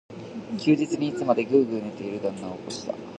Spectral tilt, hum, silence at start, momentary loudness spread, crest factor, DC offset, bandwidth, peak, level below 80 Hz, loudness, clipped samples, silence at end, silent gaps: -6 dB/octave; none; 0.1 s; 13 LU; 20 dB; under 0.1%; 10 kHz; -6 dBFS; -66 dBFS; -26 LUFS; under 0.1%; 0 s; none